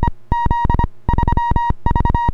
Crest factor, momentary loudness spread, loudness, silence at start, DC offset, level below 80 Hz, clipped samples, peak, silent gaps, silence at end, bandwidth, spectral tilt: 16 dB; 3 LU; -18 LUFS; 0 s; under 0.1%; -20 dBFS; under 0.1%; 0 dBFS; none; 0 s; 6.4 kHz; -8.5 dB/octave